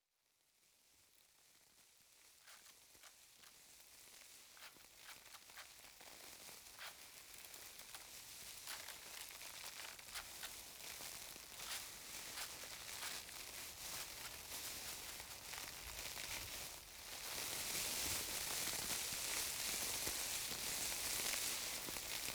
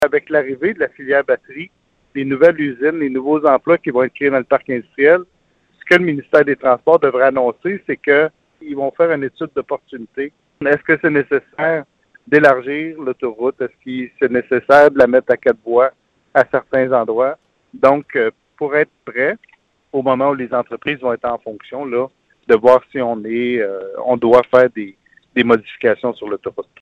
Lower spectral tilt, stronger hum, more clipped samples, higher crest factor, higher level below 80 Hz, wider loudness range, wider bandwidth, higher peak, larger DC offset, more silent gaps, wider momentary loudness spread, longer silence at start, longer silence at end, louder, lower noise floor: second, 0 dB/octave vs -7 dB/octave; neither; neither; about the same, 20 dB vs 16 dB; second, -70 dBFS vs -58 dBFS; first, 19 LU vs 5 LU; first, over 20 kHz vs 7.4 kHz; second, -30 dBFS vs 0 dBFS; neither; neither; first, 19 LU vs 14 LU; first, 0.85 s vs 0 s; second, 0 s vs 0.2 s; second, -45 LUFS vs -16 LUFS; first, -82 dBFS vs -48 dBFS